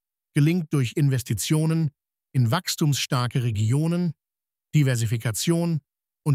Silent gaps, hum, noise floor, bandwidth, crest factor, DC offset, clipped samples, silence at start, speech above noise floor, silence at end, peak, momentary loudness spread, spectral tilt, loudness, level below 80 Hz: none; none; under -90 dBFS; 16 kHz; 14 dB; under 0.1%; under 0.1%; 0.35 s; over 68 dB; 0 s; -8 dBFS; 6 LU; -5.5 dB/octave; -24 LUFS; -60 dBFS